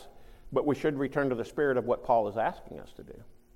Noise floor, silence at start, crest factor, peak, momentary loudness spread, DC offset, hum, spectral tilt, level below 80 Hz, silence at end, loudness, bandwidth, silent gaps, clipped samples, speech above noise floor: -49 dBFS; 0 s; 18 dB; -12 dBFS; 20 LU; under 0.1%; none; -7.5 dB/octave; -54 dBFS; 0.2 s; -29 LUFS; 15.5 kHz; none; under 0.1%; 19 dB